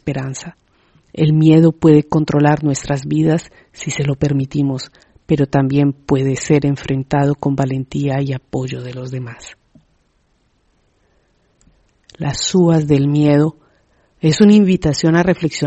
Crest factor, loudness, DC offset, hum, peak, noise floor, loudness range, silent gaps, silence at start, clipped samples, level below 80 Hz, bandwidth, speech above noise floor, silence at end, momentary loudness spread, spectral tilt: 16 dB; -15 LUFS; under 0.1%; none; 0 dBFS; -60 dBFS; 13 LU; none; 0.05 s; under 0.1%; -44 dBFS; 8.4 kHz; 46 dB; 0 s; 16 LU; -6.5 dB/octave